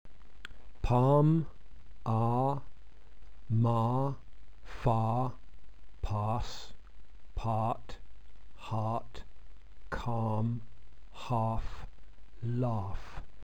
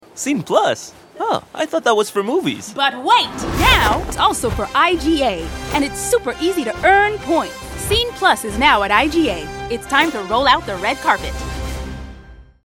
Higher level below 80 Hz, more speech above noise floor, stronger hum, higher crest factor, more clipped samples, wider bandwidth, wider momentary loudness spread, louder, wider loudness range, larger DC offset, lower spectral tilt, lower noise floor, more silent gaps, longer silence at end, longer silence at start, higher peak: second, -46 dBFS vs -32 dBFS; about the same, 21 dB vs 23 dB; neither; about the same, 18 dB vs 16 dB; neither; second, 8 kHz vs 17.5 kHz; first, 23 LU vs 12 LU; second, -33 LUFS vs -17 LUFS; first, 7 LU vs 2 LU; first, 1% vs under 0.1%; first, -8.5 dB/octave vs -3.5 dB/octave; first, -52 dBFS vs -40 dBFS; neither; about the same, 0.2 s vs 0.25 s; about the same, 0.05 s vs 0.15 s; second, -14 dBFS vs 0 dBFS